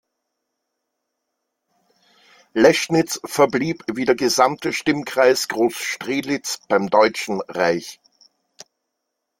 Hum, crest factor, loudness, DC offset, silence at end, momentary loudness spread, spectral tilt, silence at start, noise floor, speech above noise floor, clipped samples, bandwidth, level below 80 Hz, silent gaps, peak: none; 20 dB; -19 LUFS; under 0.1%; 1.45 s; 9 LU; -4 dB/octave; 2.55 s; -78 dBFS; 59 dB; under 0.1%; 17 kHz; -62 dBFS; none; -2 dBFS